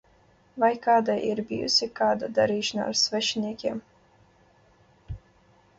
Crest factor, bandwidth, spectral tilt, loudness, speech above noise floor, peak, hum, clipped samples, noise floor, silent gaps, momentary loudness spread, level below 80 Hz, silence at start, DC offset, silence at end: 18 dB; 8 kHz; -3 dB/octave; -25 LUFS; 35 dB; -10 dBFS; none; under 0.1%; -60 dBFS; none; 21 LU; -56 dBFS; 0.55 s; under 0.1%; 0.6 s